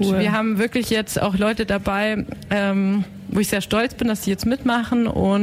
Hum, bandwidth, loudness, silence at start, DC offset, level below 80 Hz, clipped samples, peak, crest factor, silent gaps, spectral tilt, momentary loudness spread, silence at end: none; 16 kHz; -21 LUFS; 0 s; under 0.1%; -42 dBFS; under 0.1%; -8 dBFS; 12 dB; none; -5.5 dB/octave; 4 LU; 0 s